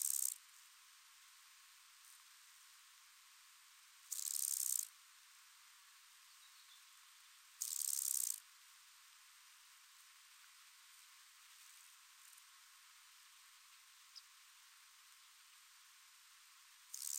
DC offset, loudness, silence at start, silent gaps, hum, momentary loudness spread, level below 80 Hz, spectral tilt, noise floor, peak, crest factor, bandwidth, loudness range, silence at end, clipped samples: under 0.1%; -40 LUFS; 0 s; none; none; 23 LU; under -90 dBFS; 8 dB/octave; -65 dBFS; -20 dBFS; 30 dB; 16 kHz; 17 LU; 0 s; under 0.1%